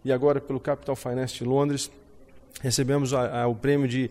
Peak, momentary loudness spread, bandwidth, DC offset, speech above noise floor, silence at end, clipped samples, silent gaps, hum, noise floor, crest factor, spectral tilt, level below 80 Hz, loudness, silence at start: -12 dBFS; 7 LU; 16 kHz; under 0.1%; 25 dB; 0 s; under 0.1%; none; none; -50 dBFS; 14 dB; -5.5 dB/octave; -56 dBFS; -26 LUFS; 0.05 s